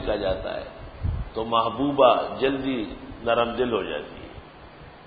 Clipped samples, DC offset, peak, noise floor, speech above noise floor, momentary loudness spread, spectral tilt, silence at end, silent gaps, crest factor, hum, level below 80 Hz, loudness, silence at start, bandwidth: under 0.1%; under 0.1%; -4 dBFS; -45 dBFS; 21 dB; 22 LU; -10.5 dB/octave; 0 s; none; 20 dB; none; -40 dBFS; -25 LUFS; 0 s; 5 kHz